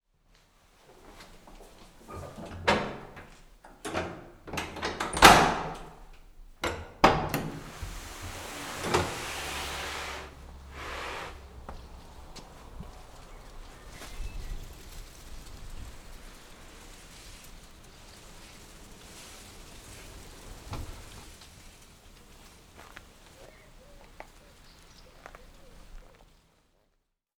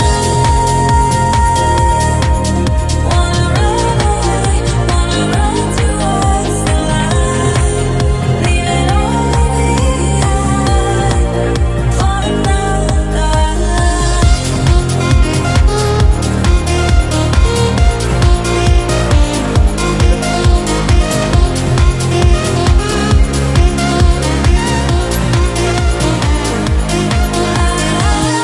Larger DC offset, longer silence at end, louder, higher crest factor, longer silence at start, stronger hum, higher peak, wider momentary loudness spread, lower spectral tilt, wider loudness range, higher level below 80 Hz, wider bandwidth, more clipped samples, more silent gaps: neither; first, 1.3 s vs 0 s; second, -28 LUFS vs -13 LUFS; first, 34 dB vs 10 dB; first, 0.9 s vs 0 s; neither; about the same, 0 dBFS vs 0 dBFS; first, 23 LU vs 2 LU; second, -3 dB/octave vs -5 dB/octave; first, 26 LU vs 1 LU; second, -46 dBFS vs -14 dBFS; first, over 20 kHz vs 12 kHz; neither; neither